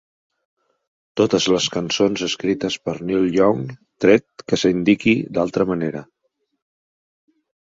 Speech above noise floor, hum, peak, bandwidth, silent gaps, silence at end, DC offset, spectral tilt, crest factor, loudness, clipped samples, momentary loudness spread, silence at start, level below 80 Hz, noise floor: over 71 dB; none; -2 dBFS; 7.8 kHz; none; 1.7 s; under 0.1%; -5 dB/octave; 20 dB; -19 LUFS; under 0.1%; 9 LU; 1.15 s; -54 dBFS; under -90 dBFS